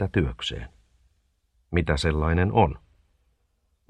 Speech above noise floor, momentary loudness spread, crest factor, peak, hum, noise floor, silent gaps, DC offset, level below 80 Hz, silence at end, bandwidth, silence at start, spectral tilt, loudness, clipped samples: 47 dB; 17 LU; 22 dB; -4 dBFS; none; -70 dBFS; none; under 0.1%; -36 dBFS; 1.1 s; 10 kHz; 0 s; -6.5 dB/octave; -25 LUFS; under 0.1%